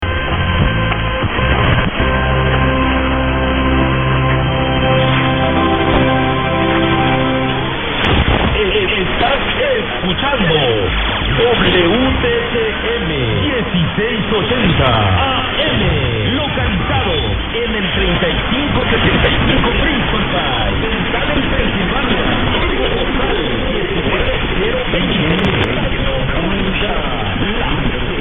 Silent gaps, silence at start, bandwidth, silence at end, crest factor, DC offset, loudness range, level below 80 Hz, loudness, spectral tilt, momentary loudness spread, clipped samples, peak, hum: none; 0 s; 4.1 kHz; 0 s; 14 dB; under 0.1%; 2 LU; -22 dBFS; -14 LUFS; -8.5 dB/octave; 4 LU; under 0.1%; 0 dBFS; none